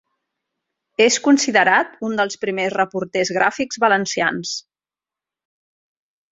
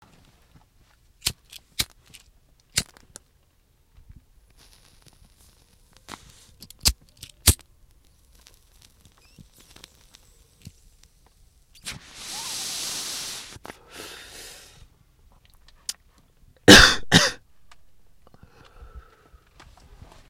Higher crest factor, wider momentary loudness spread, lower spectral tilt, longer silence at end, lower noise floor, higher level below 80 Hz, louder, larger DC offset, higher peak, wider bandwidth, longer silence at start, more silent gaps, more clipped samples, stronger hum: second, 20 dB vs 28 dB; second, 10 LU vs 29 LU; about the same, -3 dB/octave vs -2.5 dB/octave; first, 1.7 s vs 1.3 s; first, under -90 dBFS vs -62 dBFS; second, -66 dBFS vs -42 dBFS; about the same, -18 LUFS vs -20 LUFS; neither; about the same, -2 dBFS vs 0 dBFS; second, 8 kHz vs 16.5 kHz; second, 1 s vs 1.25 s; neither; neither; neither